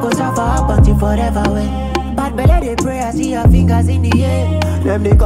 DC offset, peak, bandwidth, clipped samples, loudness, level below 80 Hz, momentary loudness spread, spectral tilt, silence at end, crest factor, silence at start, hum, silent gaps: under 0.1%; -2 dBFS; 15 kHz; under 0.1%; -14 LUFS; -18 dBFS; 6 LU; -7 dB/octave; 0 s; 12 dB; 0 s; none; none